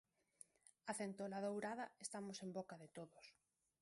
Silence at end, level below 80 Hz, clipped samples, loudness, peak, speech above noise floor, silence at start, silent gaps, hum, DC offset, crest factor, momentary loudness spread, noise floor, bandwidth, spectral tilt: 0.5 s; under -90 dBFS; under 0.1%; -50 LUFS; -30 dBFS; 20 dB; 0.65 s; none; none; under 0.1%; 20 dB; 19 LU; -70 dBFS; 11.5 kHz; -4.5 dB/octave